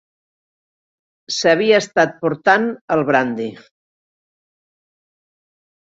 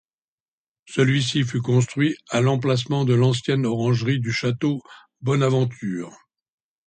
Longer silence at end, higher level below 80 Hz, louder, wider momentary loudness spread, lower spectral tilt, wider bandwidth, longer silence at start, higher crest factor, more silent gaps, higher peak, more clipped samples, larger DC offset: first, 2.3 s vs 0.75 s; second, -64 dBFS vs -58 dBFS; first, -17 LUFS vs -22 LUFS; about the same, 10 LU vs 10 LU; second, -4 dB/octave vs -6 dB/octave; second, 8 kHz vs 9.2 kHz; first, 1.3 s vs 0.9 s; about the same, 20 dB vs 16 dB; first, 2.81-2.88 s vs none; first, -2 dBFS vs -6 dBFS; neither; neither